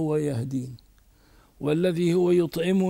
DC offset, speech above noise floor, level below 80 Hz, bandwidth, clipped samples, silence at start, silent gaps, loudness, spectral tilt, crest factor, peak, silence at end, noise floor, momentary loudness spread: under 0.1%; 34 dB; -58 dBFS; 16 kHz; under 0.1%; 0 s; none; -25 LUFS; -7.5 dB/octave; 14 dB; -10 dBFS; 0 s; -57 dBFS; 11 LU